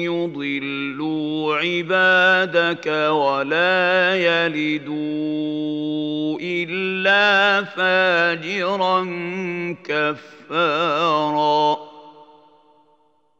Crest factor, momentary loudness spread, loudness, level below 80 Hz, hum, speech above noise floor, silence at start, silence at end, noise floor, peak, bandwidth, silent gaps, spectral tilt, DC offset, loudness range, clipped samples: 18 dB; 10 LU; -19 LUFS; -78 dBFS; none; 42 dB; 0 s; 1.15 s; -61 dBFS; -4 dBFS; 7.8 kHz; none; -5 dB/octave; under 0.1%; 4 LU; under 0.1%